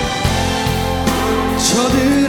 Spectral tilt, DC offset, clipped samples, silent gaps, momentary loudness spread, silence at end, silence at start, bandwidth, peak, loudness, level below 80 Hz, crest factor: -4 dB/octave; under 0.1%; under 0.1%; none; 4 LU; 0 s; 0 s; 19 kHz; -2 dBFS; -16 LUFS; -28 dBFS; 14 dB